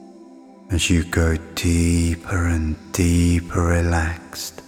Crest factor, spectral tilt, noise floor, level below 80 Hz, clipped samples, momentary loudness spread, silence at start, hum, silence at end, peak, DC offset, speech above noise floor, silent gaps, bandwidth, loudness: 16 dB; -5.5 dB/octave; -44 dBFS; -34 dBFS; under 0.1%; 7 LU; 0 s; none; 0.05 s; -4 dBFS; under 0.1%; 24 dB; none; 16 kHz; -21 LUFS